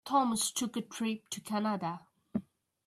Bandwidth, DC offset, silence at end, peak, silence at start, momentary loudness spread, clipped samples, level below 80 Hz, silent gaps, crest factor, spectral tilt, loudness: 14 kHz; under 0.1%; 0.45 s; -16 dBFS; 0.05 s; 11 LU; under 0.1%; -76 dBFS; none; 18 dB; -3.5 dB/octave; -34 LUFS